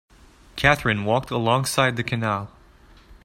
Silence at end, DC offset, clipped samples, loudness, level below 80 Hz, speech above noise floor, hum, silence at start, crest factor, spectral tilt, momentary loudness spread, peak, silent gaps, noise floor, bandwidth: 0.1 s; under 0.1%; under 0.1%; -22 LUFS; -46 dBFS; 29 dB; none; 0.55 s; 24 dB; -4.5 dB/octave; 10 LU; 0 dBFS; none; -51 dBFS; 16 kHz